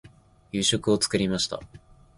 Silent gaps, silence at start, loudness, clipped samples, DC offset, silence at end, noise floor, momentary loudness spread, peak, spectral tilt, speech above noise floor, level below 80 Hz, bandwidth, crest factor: none; 0.05 s; -25 LUFS; under 0.1%; under 0.1%; 0.4 s; -49 dBFS; 10 LU; -8 dBFS; -3.5 dB/octave; 24 dB; -52 dBFS; 11.5 kHz; 20 dB